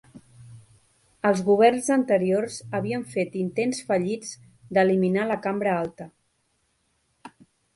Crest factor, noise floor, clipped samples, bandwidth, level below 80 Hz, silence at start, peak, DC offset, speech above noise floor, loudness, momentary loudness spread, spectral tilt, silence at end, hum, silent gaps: 20 dB; -71 dBFS; under 0.1%; 11.5 kHz; -66 dBFS; 0.15 s; -6 dBFS; under 0.1%; 47 dB; -24 LUFS; 14 LU; -6 dB/octave; 0.5 s; none; none